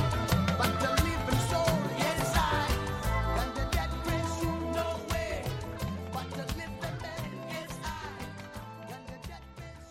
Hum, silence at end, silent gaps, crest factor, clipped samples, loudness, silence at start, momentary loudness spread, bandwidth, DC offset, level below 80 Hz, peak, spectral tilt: none; 0 s; none; 20 dB; under 0.1%; -32 LUFS; 0 s; 16 LU; 16.5 kHz; under 0.1%; -40 dBFS; -12 dBFS; -5 dB/octave